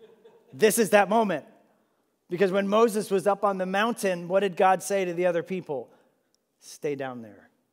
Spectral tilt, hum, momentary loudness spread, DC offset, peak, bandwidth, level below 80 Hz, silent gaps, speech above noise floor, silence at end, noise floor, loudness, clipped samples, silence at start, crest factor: -4.5 dB/octave; none; 14 LU; under 0.1%; -6 dBFS; 16 kHz; -86 dBFS; none; 47 dB; 0.4 s; -72 dBFS; -25 LUFS; under 0.1%; 0.55 s; 20 dB